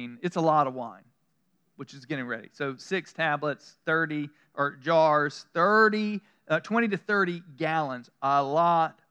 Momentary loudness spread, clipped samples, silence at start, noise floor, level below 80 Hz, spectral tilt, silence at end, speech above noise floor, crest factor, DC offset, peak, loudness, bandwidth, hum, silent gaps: 14 LU; under 0.1%; 0 s; -74 dBFS; under -90 dBFS; -6 dB/octave; 0.2 s; 47 dB; 20 dB; under 0.1%; -8 dBFS; -27 LUFS; 9.6 kHz; none; none